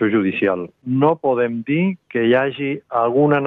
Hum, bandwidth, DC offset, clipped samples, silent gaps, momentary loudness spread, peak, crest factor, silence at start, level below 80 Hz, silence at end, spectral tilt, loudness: none; 4 kHz; under 0.1%; under 0.1%; none; 6 LU; -4 dBFS; 14 dB; 0 s; -62 dBFS; 0 s; -10 dB/octave; -19 LUFS